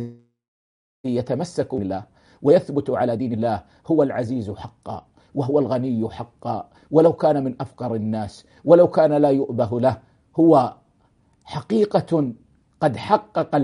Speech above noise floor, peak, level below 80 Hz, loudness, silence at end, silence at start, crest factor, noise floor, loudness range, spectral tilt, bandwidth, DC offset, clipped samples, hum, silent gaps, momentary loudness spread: 41 dB; 0 dBFS; -58 dBFS; -21 LUFS; 0 s; 0 s; 20 dB; -61 dBFS; 5 LU; -8.5 dB/octave; 10.5 kHz; under 0.1%; under 0.1%; none; 0.48-1.04 s; 17 LU